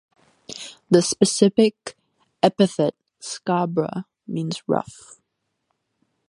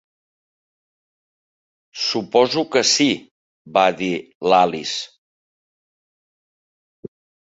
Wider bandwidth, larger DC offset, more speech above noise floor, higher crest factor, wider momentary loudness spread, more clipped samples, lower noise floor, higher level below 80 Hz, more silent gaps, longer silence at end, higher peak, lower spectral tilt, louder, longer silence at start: first, 11.5 kHz vs 8 kHz; neither; second, 55 dB vs over 72 dB; about the same, 22 dB vs 22 dB; first, 20 LU vs 11 LU; neither; second, -76 dBFS vs under -90 dBFS; about the same, -66 dBFS vs -64 dBFS; second, none vs 3.31-3.65 s, 4.35-4.40 s; second, 1.35 s vs 2.5 s; about the same, 0 dBFS vs -2 dBFS; first, -5 dB/octave vs -3 dB/octave; about the same, -21 LUFS vs -19 LUFS; second, 0.5 s vs 1.95 s